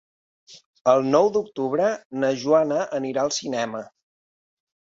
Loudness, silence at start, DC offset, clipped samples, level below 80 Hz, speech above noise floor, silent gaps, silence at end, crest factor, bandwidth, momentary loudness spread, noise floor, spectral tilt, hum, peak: -22 LUFS; 0.5 s; under 0.1%; under 0.1%; -68 dBFS; over 68 dB; 0.66-0.73 s, 0.81-0.85 s, 2.05-2.10 s; 1.05 s; 20 dB; 7.8 kHz; 8 LU; under -90 dBFS; -4.5 dB/octave; none; -4 dBFS